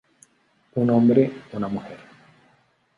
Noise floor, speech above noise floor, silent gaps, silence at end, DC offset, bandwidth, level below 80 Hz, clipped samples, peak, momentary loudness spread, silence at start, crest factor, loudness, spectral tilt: -63 dBFS; 42 dB; none; 1 s; under 0.1%; 10.5 kHz; -62 dBFS; under 0.1%; -4 dBFS; 20 LU; 0.75 s; 20 dB; -22 LUFS; -9.5 dB/octave